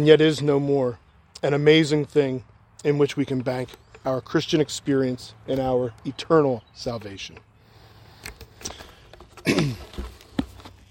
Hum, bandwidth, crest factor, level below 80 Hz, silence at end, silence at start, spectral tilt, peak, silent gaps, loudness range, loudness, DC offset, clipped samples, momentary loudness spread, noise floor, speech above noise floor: none; 16.5 kHz; 22 dB; -50 dBFS; 0.2 s; 0 s; -6 dB/octave; -2 dBFS; none; 8 LU; -23 LUFS; under 0.1%; under 0.1%; 20 LU; -52 dBFS; 30 dB